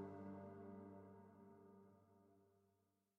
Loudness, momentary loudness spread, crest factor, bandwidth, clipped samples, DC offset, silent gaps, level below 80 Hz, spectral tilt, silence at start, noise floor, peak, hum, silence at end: -60 LUFS; 11 LU; 18 dB; 5.4 kHz; under 0.1%; under 0.1%; none; under -90 dBFS; -9 dB/octave; 0 s; -85 dBFS; -42 dBFS; none; 0.4 s